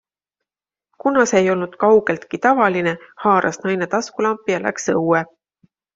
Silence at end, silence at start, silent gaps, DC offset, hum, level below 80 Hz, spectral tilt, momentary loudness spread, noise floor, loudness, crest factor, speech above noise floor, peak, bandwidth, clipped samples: 0.7 s; 1.05 s; none; under 0.1%; none; -62 dBFS; -5 dB/octave; 7 LU; -89 dBFS; -18 LUFS; 18 dB; 71 dB; -2 dBFS; 7.8 kHz; under 0.1%